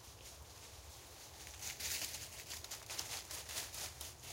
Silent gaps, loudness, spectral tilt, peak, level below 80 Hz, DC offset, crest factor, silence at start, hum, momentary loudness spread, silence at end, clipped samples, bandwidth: none; -45 LUFS; -0.5 dB/octave; -22 dBFS; -62 dBFS; under 0.1%; 26 dB; 0 s; none; 13 LU; 0 s; under 0.1%; 17 kHz